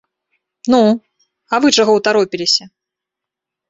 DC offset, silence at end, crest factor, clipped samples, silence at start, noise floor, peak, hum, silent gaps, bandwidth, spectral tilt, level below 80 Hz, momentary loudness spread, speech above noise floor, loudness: under 0.1%; 1 s; 16 dB; under 0.1%; 0.65 s; -83 dBFS; -2 dBFS; none; none; 8.4 kHz; -3.5 dB/octave; -60 dBFS; 8 LU; 70 dB; -14 LUFS